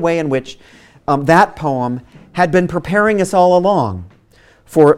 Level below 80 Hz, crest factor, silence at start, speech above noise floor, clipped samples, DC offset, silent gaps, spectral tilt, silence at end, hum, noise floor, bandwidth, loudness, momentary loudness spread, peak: -46 dBFS; 14 dB; 0 s; 35 dB; 0.1%; under 0.1%; none; -6.5 dB/octave; 0 s; none; -49 dBFS; 16 kHz; -14 LUFS; 16 LU; 0 dBFS